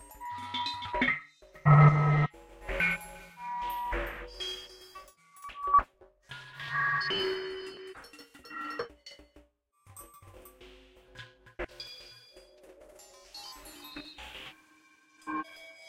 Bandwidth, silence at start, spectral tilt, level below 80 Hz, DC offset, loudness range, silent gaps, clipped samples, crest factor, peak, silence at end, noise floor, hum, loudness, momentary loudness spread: 14.5 kHz; 0 s; -6.5 dB/octave; -52 dBFS; under 0.1%; 21 LU; none; under 0.1%; 22 dB; -10 dBFS; 0 s; -64 dBFS; none; -29 LUFS; 24 LU